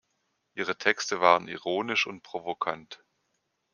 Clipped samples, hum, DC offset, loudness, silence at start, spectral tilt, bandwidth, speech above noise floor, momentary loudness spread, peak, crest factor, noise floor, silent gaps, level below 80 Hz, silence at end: under 0.1%; none; under 0.1%; -27 LUFS; 0.55 s; -2.5 dB/octave; 10 kHz; 49 dB; 16 LU; -4 dBFS; 26 dB; -77 dBFS; none; -76 dBFS; 0.8 s